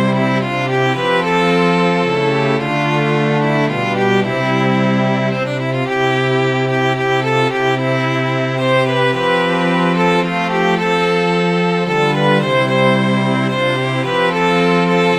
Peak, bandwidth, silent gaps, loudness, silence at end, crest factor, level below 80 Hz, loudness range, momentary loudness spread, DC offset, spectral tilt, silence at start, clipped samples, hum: -2 dBFS; 11.5 kHz; none; -15 LUFS; 0 s; 12 dB; -54 dBFS; 1 LU; 3 LU; 0.2%; -6.5 dB/octave; 0 s; under 0.1%; none